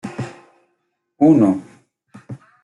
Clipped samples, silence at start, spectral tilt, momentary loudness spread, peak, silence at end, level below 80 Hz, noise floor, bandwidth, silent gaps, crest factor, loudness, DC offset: under 0.1%; 0.05 s; -9 dB/octave; 25 LU; -4 dBFS; 0.3 s; -62 dBFS; -71 dBFS; 10 kHz; none; 18 dB; -16 LUFS; under 0.1%